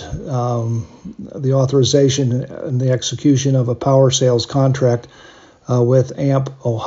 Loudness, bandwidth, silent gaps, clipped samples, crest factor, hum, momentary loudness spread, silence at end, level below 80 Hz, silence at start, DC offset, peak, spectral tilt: -16 LUFS; 7.8 kHz; none; under 0.1%; 16 dB; none; 10 LU; 0 s; -46 dBFS; 0 s; under 0.1%; -2 dBFS; -6 dB/octave